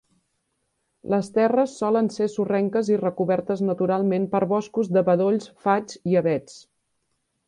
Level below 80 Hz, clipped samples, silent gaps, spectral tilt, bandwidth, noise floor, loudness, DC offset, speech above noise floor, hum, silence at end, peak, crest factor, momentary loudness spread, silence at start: -66 dBFS; under 0.1%; none; -7.5 dB/octave; 10.5 kHz; -74 dBFS; -23 LUFS; under 0.1%; 52 dB; none; 0.9 s; -6 dBFS; 16 dB; 5 LU; 1.05 s